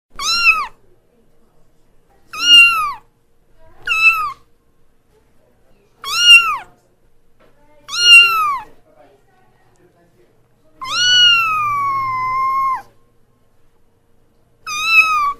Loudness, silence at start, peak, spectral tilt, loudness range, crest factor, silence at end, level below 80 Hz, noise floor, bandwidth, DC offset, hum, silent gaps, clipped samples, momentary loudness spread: -10 LUFS; 0.15 s; 0 dBFS; 2 dB/octave; 8 LU; 16 dB; 0.05 s; -48 dBFS; -54 dBFS; 15.5 kHz; under 0.1%; none; none; under 0.1%; 20 LU